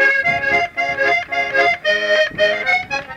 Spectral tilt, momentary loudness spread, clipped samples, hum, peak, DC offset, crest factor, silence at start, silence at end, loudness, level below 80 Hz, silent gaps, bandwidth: -3 dB/octave; 3 LU; under 0.1%; none; -4 dBFS; under 0.1%; 12 dB; 0 s; 0 s; -16 LUFS; -50 dBFS; none; 13 kHz